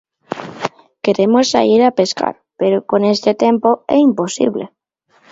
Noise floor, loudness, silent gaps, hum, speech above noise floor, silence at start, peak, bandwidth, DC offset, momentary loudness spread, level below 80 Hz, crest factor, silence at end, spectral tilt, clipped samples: -56 dBFS; -15 LUFS; none; none; 42 dB; 0.3 s; 0 dBFS; 8 kHz; under 0.1%; 14 LU; -60 dBFS; 16 dB; 0.65 s; -5 dB/octave; under 0.1%